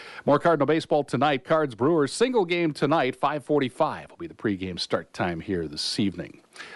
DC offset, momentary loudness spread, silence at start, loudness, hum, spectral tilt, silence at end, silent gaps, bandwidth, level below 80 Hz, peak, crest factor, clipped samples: under 0.1%; 8 LU; 0 s; -25 LUFS; none; -5.5 dB/octave; 0 s; none; 11.5 kHz; -60 dBFS; -10 dBFS; 16 dB; under 0.1%